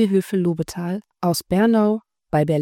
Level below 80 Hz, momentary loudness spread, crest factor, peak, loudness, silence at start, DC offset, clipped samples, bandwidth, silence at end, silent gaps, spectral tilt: -54 dBFS; 10 LU; 14 dB; -6 dBFS; -21 LUFS; 0 s; under 0.1%; under 0.1%; 17.5 kHz; 0 s; none; -6.5 dB/octave